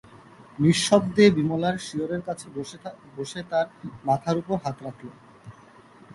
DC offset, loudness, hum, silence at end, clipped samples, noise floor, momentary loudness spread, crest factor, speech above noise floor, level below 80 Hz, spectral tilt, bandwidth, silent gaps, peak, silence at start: under 0.1%; -24 LUFS; none; 0.65 s; under 0.1%; -51 dBFS; 21 LU; 22 dB; 27 dB; -60 dBFS; -5.5 dB/octave; 11.5 kHz; none; -4 dBFS; 0.15 s